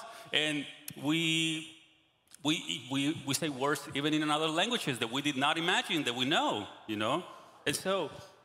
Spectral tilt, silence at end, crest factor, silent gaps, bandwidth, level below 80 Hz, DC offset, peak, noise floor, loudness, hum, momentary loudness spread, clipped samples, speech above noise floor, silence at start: -3.5 dB/octave; 0.15 s; 22 dB; none; 16 kHz; -76 dBFS; under 0.1%; -10 dBFS; -66 dBFS; -32 LUFS; none; 9 LU; under 0.1%; 34 dB; 0 s